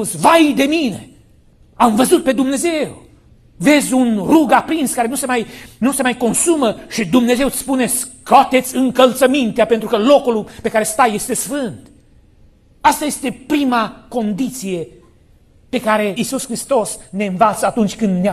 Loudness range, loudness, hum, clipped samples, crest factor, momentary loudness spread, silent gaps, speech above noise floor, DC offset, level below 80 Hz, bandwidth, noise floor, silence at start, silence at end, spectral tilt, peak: 6 LU; -15 LUFS; none; under 0.1%; 16 dB; 10 LU; none; 34 dB; under 0.1%; -48 dBFS; 14.5 kHz; -49 dBFS; 0 s; 0 s; -4 dB/octave; 0 dBFS